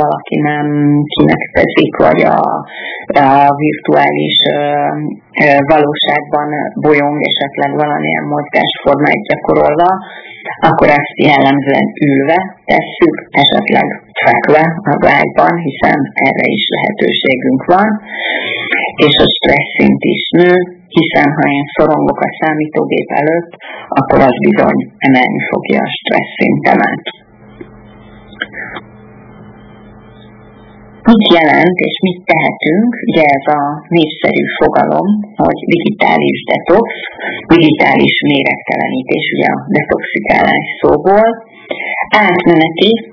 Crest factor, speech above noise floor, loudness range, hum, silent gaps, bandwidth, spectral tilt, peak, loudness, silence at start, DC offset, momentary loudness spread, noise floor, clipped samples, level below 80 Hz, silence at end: 10 dB; 26 dB; 3 LU; none; none; 5.4 kHz; -7.5 dB/octave; 0 dBFS; -11 LUFS; 0 s; under 0.1%; 7 LU; -37 dBFS; 1%; -42 dBFS; 0 s